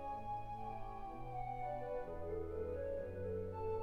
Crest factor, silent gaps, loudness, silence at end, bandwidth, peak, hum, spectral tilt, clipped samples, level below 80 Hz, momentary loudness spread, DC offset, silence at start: 12 dB; none; -45 LUFS; 0 s; 13 kHz; -32 dBFS; none; -8.5 dB/octave; under 0.1%; -54 dBFS; 5 LU; 0.1%; 0 s